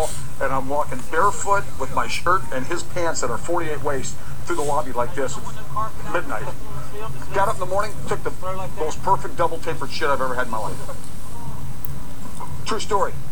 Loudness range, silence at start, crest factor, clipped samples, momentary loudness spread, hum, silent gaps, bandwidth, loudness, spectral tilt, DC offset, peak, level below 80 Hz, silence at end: 4 LU; 0 s; 20 dB; under 0.1%; 13 LU; none; none; over 20 kHz; -25 LUFS; -4.5 dB/octave; 10%; -4 dBFS; -38 dBFS; 0 s